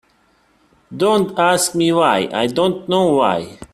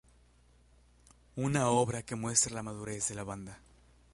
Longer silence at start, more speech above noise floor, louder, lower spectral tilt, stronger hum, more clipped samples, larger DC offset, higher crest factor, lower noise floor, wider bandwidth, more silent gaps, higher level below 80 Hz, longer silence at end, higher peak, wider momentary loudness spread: second, 0.9 s vs 1.35 s; first, 41 dB vs 31 dB; first, -16 LUFS vs -32 LUFS; about the same, -4 dB/octave vs -4 dB/octave; second, none vs 60 Hz at -55 dBFS; neither; neither; second, 16 dB vs 24 dB; second, -57 dBFS vs -64 dBFS; first, 16 kHz vs 11.5 kHz; neither; about the same, -56 dBFS vs -60 dBFS; second, 0.1 s vs 0.55 s; first, 0 dBFS vs -12 dBFS; second, 5 LU vs 16 LU